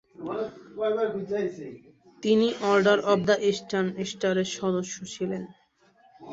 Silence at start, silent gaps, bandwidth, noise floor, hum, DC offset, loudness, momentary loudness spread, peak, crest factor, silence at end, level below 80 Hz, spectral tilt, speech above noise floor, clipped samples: 0.2 s; none; 8 kHz; -61 dBFS; none; under 0.1%; -26 LUFS; 13 LU; -8 dBFS; 20 dB; 0 s; -68 dBFS; -5 dB/octave; 35 dB; under 0.1%